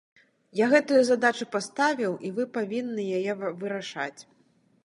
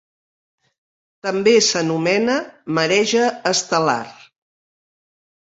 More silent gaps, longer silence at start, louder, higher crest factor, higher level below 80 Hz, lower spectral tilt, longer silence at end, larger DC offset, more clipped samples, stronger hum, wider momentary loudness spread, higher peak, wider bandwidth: neither; second, 0.55 s vs 1.25 s; second, -26 LUFS vs -18 LUFS; about the same, 20 dB vs 18 dB; second, -82 dBFS vs -66 dBFS; first, -4.5 dB/octave vs -3 dB/octave; second, 0.65 s vs 1.35 s; neither; neither; neither; about the same, 12 LU vs 10 LU; second, -6 dBFS vs -2 dBFS; first, 11.5 kHz vs 8 kHz